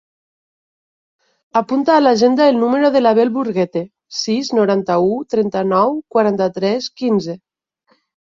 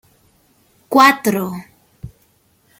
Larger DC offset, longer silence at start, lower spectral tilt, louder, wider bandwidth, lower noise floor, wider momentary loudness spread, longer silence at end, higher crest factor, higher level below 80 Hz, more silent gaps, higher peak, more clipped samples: neither; first, 1.55 s vs 0.9 s; first, -5.5 dB/octave vs -4 dB/octave; about the same, -16 LUFS vs -14 LUFS; second, 7.6 kHz vs 17 kHz; about the same, -61 dBFS vs -58 dBFS; second, 8 LU vs 17 LU; first, 0.9 s vs 0.75 s; about the same, 14 dB vs 18 dB; second, -62 dBFS vs -52 dBFS; neither; about the same, -2 dBFS vs 0 dBFS; neither